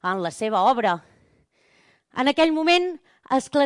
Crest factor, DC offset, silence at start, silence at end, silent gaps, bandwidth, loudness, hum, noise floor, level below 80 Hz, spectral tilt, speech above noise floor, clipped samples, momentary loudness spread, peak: 14 dB; under 0.1%; 0.05 s; 0 s; none; 11.5 kHz; -22 LUFS; none; -62 dBFS; -64 dBFS; -4 dB/octave; 41 dB; under 0.1%; 11 LU; -8 dBFS